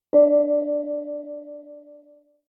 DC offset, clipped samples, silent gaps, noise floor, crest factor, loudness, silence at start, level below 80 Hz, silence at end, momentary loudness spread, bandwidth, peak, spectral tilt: under 0.1%; under 0.1%; none; -54 dBFS; 16 dB; -21 LUFS; 0.15 s; -80 dBFS; 0.7 s; 22 LU; 2.1 kHz; -6 dBFS; -11 dB/octave